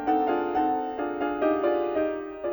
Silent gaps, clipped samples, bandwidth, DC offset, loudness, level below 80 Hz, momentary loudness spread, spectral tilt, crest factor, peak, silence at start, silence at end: none; under 0.1%; over 20 kHz; under 0.1%; -27 LUFS; -58 dBFS; 5 LU; -7.5 dB/octave; 12 dB; -14 dBFS; 0 s; 0 s